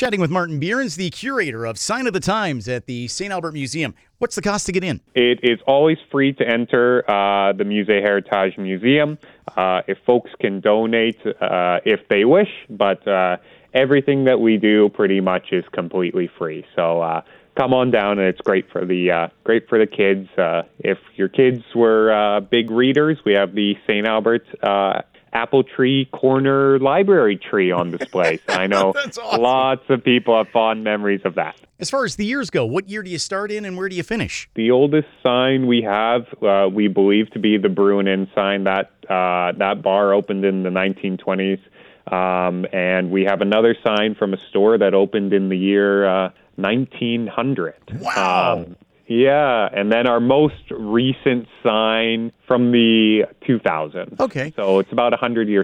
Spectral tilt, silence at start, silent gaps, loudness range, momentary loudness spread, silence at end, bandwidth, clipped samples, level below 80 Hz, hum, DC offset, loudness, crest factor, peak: -5.5 dB/octave; 0 s; none; 4 LU; 9 LU; 0 s; 11.5 kHz; under 0.1%; -58 dBFS; none; under 0.1%; -18 LUFS; 16 dB; -2 dBFS